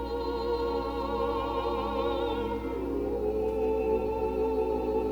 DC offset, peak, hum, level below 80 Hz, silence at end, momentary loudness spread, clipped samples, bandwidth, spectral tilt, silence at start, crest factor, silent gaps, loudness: under 0.1%; -16 dBFS; 60 Hz at -40 dBFS; -42 dBFS; 0 s; 3 LU; under 0.1%; 20 kHz; -7.5 dB/octave; 0 s; 12 dB; none; -30 LUFS